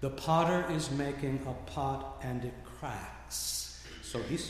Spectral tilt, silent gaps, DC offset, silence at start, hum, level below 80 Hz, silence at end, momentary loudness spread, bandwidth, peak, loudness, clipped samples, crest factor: -4.5 dB/octave; none; under 0.1%; 0 s; none; -50 dBFS; 0 s; 14 LU; 15.5 kHz; -16 dBFS; -35 LUFS; under 0.1%; 18 dB